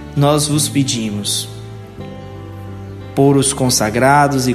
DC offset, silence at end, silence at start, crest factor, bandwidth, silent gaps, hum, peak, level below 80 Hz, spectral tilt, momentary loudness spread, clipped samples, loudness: under 0.1%; 0 s; 0 s; 16 dB; 14 kHz; none; none; 0 dBFS; -40 dBFS; -4.5 dB/octave; 19 LU; under 0.1%; -14 LUFS